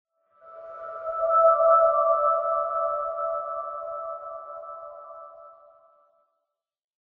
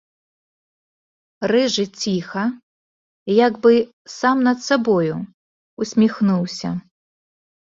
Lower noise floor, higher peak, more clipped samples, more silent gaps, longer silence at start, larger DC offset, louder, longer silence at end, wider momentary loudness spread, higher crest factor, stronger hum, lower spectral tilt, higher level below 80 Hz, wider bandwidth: second, -82 dBFS vs under -90 dBFS; second, -8 dBFS vs -2 dBFS; neither; second, none vs 2.63-3.26 s, 3.93-4.05 s, 5.34-5.77 s; second, 0.45 s vs 1.4 s; neither; second, -23 LUFS vs -19 LUFS; first, 1.5 s vs 0.85 s; first, 24 LU vs 14 LU; about the same, 18 dB vs 18 dB; neither; about the same, -6.5 dB/octave vs -5.5 dB/octave; about the same, -66 dBFS vs -62 dBFS; second, 2.4 kHz vs 7.8 kHz